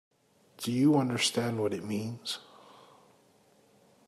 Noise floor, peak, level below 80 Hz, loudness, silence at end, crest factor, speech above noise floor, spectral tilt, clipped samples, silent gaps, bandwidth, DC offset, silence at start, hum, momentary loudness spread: -64 dBFS; -14 dBFS; -76 dBFS; -30 LUFS; 1.65 s; 18 dB; 35 dB; -4.5 dB/octave; under 0.1%; none; 14 kHz; under 0.1%; 0.6 s; none; 12 LU